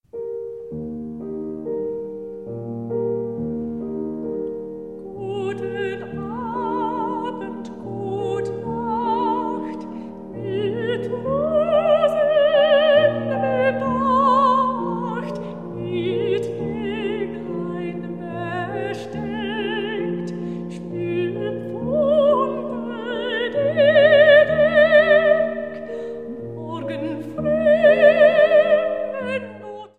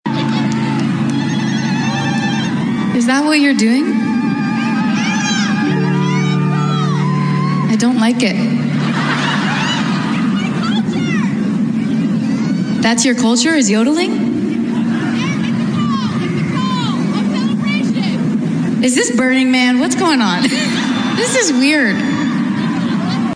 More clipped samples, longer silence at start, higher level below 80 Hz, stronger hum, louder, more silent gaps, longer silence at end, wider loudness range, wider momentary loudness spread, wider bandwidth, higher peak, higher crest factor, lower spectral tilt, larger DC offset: neither; about the same, 0.15 s vs 0.05 s; about the same, -52 dBFS vs -56 dBFS; neither; second, -20 LUFS vs -15 LUFS; neither; about the same, 0.1 s vs 0 s; first, 12 LU vs 3 LU; first, 17 LU vs 5 LU; second, 8.2 kHz vs 10 kHz; about the same, -2 dBFS vs -2 dBFS; first, 18 dB vs 12 dB; first, -7 dB/octave vs -5 dB/octave; first, 0.2% vs under 0.1%